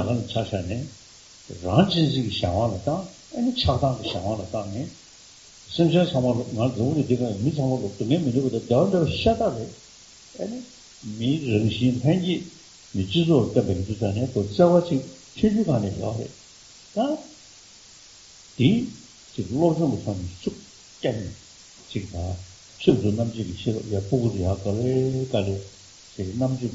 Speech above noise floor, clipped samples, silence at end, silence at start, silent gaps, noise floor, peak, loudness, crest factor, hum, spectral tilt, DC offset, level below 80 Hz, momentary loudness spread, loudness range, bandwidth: 25 dB; under 0.1%; 0 s; 0 s; none; -49 dBFS; -4 dBFS; -24 LUFS; 22 dB; none; -6.5 dB/octave; under 0.1%; -50 dBFS; 17 LU; 5 LU; 8 kHz